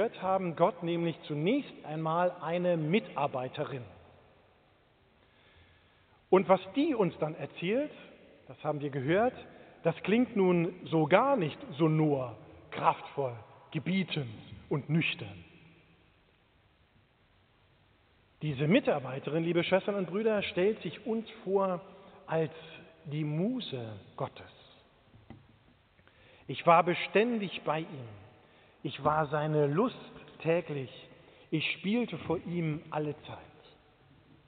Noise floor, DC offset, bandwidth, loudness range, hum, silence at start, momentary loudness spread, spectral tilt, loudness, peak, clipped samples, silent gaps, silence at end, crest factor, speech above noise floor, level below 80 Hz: -67 dBFS; under 0.1%; 4.6 kHz; 8 LU; none; 0 s; 17 LU; -5 dB/octave; -31 LUFS; -8 dBFS; under 0.1%; none; 1.05 s; 24 dB; 36 dB; -70 dBFS